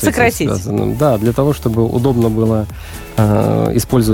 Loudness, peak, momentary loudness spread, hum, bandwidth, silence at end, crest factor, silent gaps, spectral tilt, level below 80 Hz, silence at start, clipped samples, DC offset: -15 LUFS; -2 dBFS; 5 LU; none; 17 kHz; 0 s; 12 dB; none; -6.5 dB/octave; -32 dBFS; 0 s; under 0.1%; under 0.1%